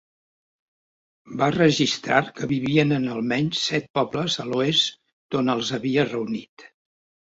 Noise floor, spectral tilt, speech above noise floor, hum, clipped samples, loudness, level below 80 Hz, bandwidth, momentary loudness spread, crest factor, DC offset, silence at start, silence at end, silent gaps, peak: under -90 dBFS; -5 dB/octave; over 67 dB; none; under 0.1%; -23 LUFS; -60 dBFS; 8 kHz; 7 LU; 22 dB; under 0.1%; 1.25 s; 0.65 s; 3.90-3.94 s, 5.13-5.29 s, 6.49-6.57 s; -4 dBFS